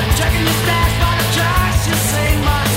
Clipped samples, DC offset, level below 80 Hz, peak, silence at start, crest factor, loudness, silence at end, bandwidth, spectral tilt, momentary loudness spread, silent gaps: under 0.1%; under 0.1%; -22 dBFS; -2 dBFS; 0 s; 12 dB; -15 LUFS; 0 s; 16.5 kHz; -4 dB/octave; 1 LU; none